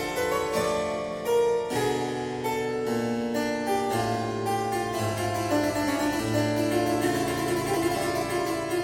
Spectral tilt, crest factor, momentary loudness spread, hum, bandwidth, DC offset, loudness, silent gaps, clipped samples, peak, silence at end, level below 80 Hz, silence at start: -5 dB/octave; 14 dB; 3 LU; none; 17 kHz; under 0.1%; -27 LUFS; none; under 0.1%; -12 dBFS; 0 s; -52 dBFS; 0 s